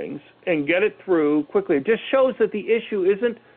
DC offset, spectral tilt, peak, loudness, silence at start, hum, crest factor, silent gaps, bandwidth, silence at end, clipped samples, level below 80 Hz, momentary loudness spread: under 0.1%; -9.5 dB/octave; -8 dBFS; -21 LUFS; 0 s; none; 14 dB; none; 4.1 kHz; 0.2 s; under 0.1%; -66 dBFS; 5 LU